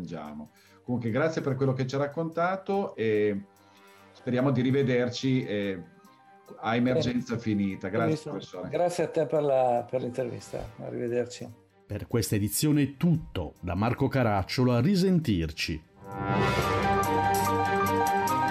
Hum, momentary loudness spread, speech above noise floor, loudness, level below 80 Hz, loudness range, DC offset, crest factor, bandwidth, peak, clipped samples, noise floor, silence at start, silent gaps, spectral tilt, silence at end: none; 13 LU; 28 dB; -28 LUFS; -52 dBFS; 4 LU; under 0.1%; 12 dB; 16 kHz; -14 dBFS; under 0.1%; -56 dBFS; 0 s; none; -6 dB/octave; 0 s